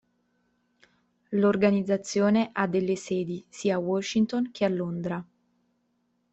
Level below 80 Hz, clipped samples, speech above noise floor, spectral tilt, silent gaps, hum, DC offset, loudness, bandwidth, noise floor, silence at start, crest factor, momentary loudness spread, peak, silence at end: -66 dBFS; under 0.1%; 47 dB; -6 dB/octave; none; none; under 0.1%; -27 LUFS; 8.2 kHz; -73 dBFS; 1.3 s; 18 dB; 8 LU; -10 dBFS; 1.1 s